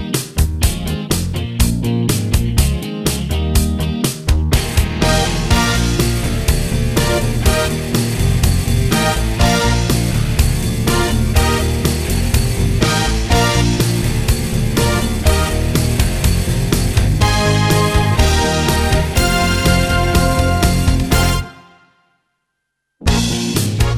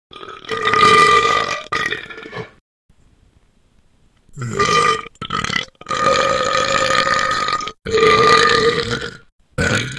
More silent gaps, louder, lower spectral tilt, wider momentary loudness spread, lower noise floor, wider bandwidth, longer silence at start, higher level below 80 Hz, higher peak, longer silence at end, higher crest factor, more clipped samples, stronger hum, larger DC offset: second, none vs 2.61-2.89 s, 9.32-9.38 s; about the same, -16 LUFS vs -15 LUFS; first, -5 dB/octave vs -3 dB/octave; second, 4 LU vs 20 LU; first, -73 dBFS vs -55 dBFS; first, 17.5 kHz vs 12 kHz; second, 0 s vs 0.15 s; first, -20 dBFS vs -44 dBFS; about the same, 0 dBFS vs 0 dBFS; about the same, 0 s vs 0 s; about the same, 14 dB vs 18 dB; neither; neither; neither